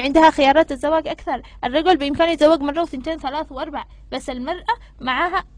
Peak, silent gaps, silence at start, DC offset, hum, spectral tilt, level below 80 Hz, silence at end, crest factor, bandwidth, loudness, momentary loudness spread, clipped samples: -2 dBFS; none; 0 s; under 0.1%; none; -4.5 dB/octave; -42 dBFS; 0.1 s; 18 dB; 10.5 kHz; -19 LUFS; 14 LU; under 0.1%